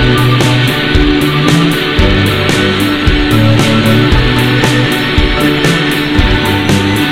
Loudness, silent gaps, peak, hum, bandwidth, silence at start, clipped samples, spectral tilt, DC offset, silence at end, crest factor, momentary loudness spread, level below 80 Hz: -9 LUFS; none; 0 dBFS; none; 17 kHz; 0 s; 0.3%; -5.5 dB/octave; under 0.1%; 0 s; 10 dB; 2 LU; -18 dBFS